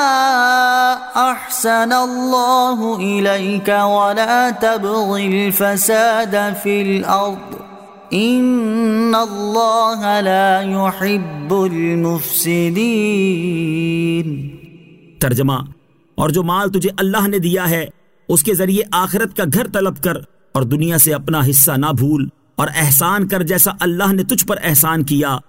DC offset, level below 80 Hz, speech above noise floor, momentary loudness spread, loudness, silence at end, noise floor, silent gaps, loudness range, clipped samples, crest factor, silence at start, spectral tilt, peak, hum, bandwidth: under 0.1%; -50 dBFS; 27 dB; 8 LU; -15 LUFS; 0.05 s; -42 dBFS; none; 4 LU; under 0.1%; 16 dB; 0 s; -4.5 dB/octave; 0 dBFS; none; 16.5 kHz